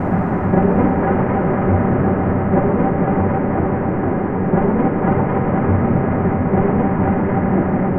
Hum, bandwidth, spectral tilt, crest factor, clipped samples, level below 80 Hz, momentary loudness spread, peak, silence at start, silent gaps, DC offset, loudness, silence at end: none; 3.3 kHz; -13 dB/octave; 14 dB; under 0.1%; -34 dBFS; 3 LU; -2 dBFS; 0 s; none; 1%; -17 LUFS; 0 s